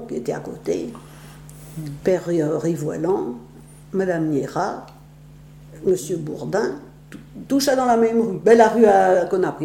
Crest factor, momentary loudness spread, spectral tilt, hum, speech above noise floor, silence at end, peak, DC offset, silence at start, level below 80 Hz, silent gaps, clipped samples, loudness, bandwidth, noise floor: 18 dB; 22 LU; -6 dB/octave; none; 25 dB; 0 s; -2 dBFS; under 0.1%; 0 s; -52 dBFS; none; under 0.1%; -20 LUFS; 17.5 kHz; -44 dBFS